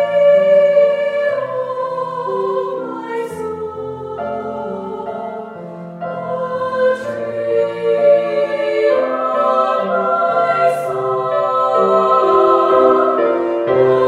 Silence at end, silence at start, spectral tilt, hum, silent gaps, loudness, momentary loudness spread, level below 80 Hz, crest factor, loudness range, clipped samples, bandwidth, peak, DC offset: 0 s; 0 s; -6.5 dB/octave; none; none; -16 LUFS; 14 LU; -60 dBFS; 14 dB; 11 LU; under 0.1%; 11 kHz; 0 dBFS; under 0.1%